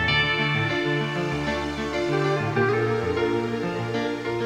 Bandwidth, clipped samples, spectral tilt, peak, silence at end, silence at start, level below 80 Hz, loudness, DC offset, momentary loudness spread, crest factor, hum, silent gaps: 12.5 kHz; under 0.1%; -6 dB/octave; -10 dBFS; 0 s; 0 s; -46 dBFS; -24 LUFS; under 0.1%; 6 LU; 16 dB; none; none